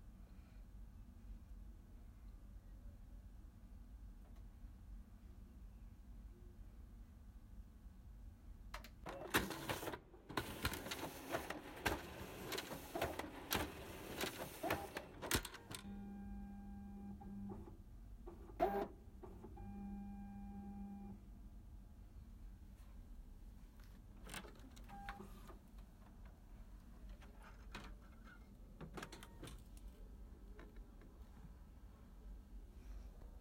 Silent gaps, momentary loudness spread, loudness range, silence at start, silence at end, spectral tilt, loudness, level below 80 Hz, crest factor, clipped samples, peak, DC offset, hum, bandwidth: none; 18 LU; 15 LU; 0 s; 0 s; -4 dB/octave; -49 LUFS; -58 dBFS; 28 dB; under 0.1%; -22 dBFS; under 0.1%; none; 16.5 kHz